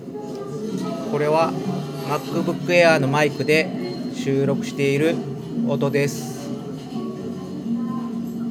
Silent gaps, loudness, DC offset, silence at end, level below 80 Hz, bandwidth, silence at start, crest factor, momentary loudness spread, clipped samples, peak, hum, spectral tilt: none; -22 LUFS; under 0.1%; 0 s; -64 dBFS; 16.5 kHz; 0 s; 20 dB; 13 LU; under 0.1%; -2 dBFS; none; -6 dB/octave